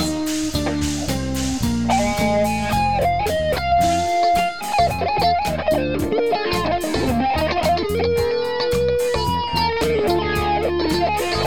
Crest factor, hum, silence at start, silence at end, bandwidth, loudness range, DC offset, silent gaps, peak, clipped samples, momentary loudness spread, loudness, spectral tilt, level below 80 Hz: 14 dB; none; 0 s; 0 s; 19 kHz; 1 LU; 1%; none; -6 dBFS; under 0.1%; 4 LU; -20 LUFS; -5 dB/octave; -34 dBFS